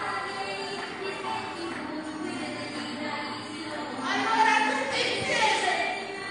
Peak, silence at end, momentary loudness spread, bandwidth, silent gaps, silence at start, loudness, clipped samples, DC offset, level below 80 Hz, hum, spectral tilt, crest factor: -10 dBFS; 0 s; 12 LU; 11.5 kHz; none; 0 s; -28 LUFS; under 0.1%; under 0.1%; -68 dBFS; none; -2.5 dB/octave; 18 dB